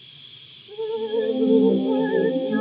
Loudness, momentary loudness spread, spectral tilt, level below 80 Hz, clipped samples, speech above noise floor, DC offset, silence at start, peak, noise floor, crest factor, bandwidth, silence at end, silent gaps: -21 LUFS; 24 LU; -11 dB/octave; -82 dBFS; under 0.1%; 25 dB; under 0.1%; 0.2 s; -6 dBFS; -45 dBFS; 16 dB; 4.9 kHz; 0 s; none